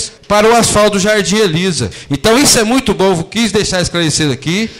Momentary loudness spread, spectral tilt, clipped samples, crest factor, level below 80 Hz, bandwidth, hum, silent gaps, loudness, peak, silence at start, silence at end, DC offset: 7 LU; -3.5 dB/octave; under 0.1%; 12 dB; -36 dBFS; 16 kHz; none; none; -11 LUFS; 0 dBFS; 0 s; 0 s; under 0.1%